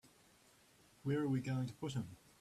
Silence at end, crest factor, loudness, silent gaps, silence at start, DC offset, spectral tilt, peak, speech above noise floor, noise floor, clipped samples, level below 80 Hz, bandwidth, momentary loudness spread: 0.25 s; 14 dB; -41 LUFS; none; 0.05 s; under 0.1%; -7 dB/octave; -28 dBFS; 29 dB; -68 dBFS; under 0.1%; -72 dBFS; 13.5 kHz; 9 LU